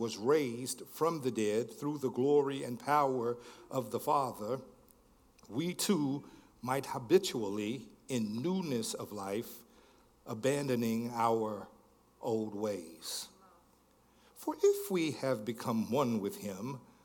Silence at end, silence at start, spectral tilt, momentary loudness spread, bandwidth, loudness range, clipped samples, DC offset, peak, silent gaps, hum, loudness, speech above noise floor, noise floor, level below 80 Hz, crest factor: 0.25 s; 0 s; -5 dB/octave; 12 LU; 18 kHz; 4 LU; under 0.1%; under 0.1%; -14 dBFS; none; none; -35 LUFS; 33 dB; -67 dBFS; -74 dBFS; 22 dB